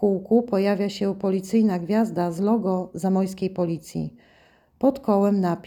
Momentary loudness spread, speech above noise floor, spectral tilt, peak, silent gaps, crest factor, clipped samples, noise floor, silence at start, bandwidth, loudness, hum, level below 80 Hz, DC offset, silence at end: 7 LU; 35 dB; -7.5 dB/octave; -8 dBFS; none; 16 dB; under 0.1%; -57 dBFS; 0 s; 17.5 kHz; -23 LUFS; none; -60 dBFS; under 0.1%; 0.05 s